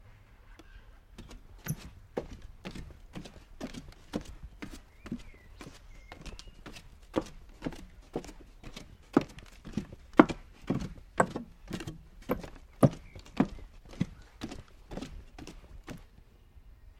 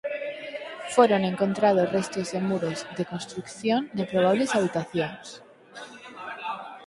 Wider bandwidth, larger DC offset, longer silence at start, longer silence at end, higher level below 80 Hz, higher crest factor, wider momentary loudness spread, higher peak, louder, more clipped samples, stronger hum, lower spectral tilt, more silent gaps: first, 15.5 kHz vs 11.5 kHz; neither; about the same, 0 s vs 0.05 s; about the same, 0.05 s vs 0 s; first, -50 dBFS vs -68 dBFS; first, 34 dB vs 22 dB; first, 23 LU vs 20 LU; about the same, -2 dBFS vs -4 dBFS; second, -34 LUFS vs -26 LUFS; neither; neither; about the same, -6.5 dB/octave vs -5.5 dB/octave; neither